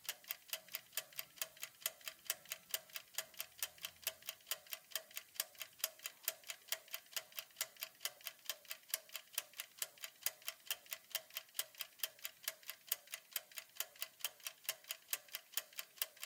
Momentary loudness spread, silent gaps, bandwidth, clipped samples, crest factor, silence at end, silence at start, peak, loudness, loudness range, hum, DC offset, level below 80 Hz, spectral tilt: 4 LU; none; 18 kHz; under 0.1%; 32 dB; 0 s; 0 s; -16 dBFS; -45 LUFS; 1 LU; none; under 0.1%; under -90 dBFS; 3 dB/octave